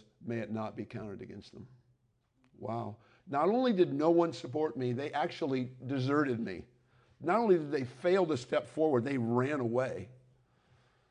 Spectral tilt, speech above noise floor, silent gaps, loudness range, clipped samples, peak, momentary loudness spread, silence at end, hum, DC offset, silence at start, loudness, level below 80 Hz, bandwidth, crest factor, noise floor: -7.5 dB/octave; 42 dB; none; 5 LU; under 0.1%; -14 dBFS; 16 LU; 0.95 s; none; under 0.1%; 0.2 s; -32 LUFS; -70 dBFS; 10 kHz; 18 dB; -74 dBFS